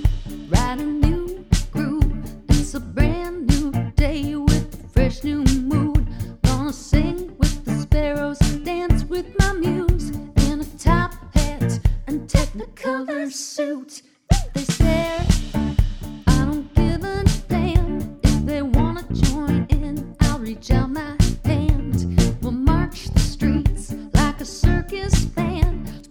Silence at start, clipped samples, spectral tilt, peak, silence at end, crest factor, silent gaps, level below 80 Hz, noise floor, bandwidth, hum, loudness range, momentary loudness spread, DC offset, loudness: 0 s; under 0.1%; -6 dB/octave; 0 dBFS; 0.1 s; 18 dB; none; -24 dBFS; -41 dBFS; 17.5 kHz; none; 2 LU; 6 LU; under 0.1%; -22 LUFS